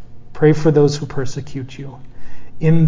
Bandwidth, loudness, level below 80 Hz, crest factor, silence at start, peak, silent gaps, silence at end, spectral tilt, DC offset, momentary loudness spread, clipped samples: 7.6 kHz; -17 LUFS; -42 dBFS; 14 dB; 0 s; 0 dBFS; none; 0 s; -7.5 dB/octave; under 0.1%; 18 LU; under 0.1%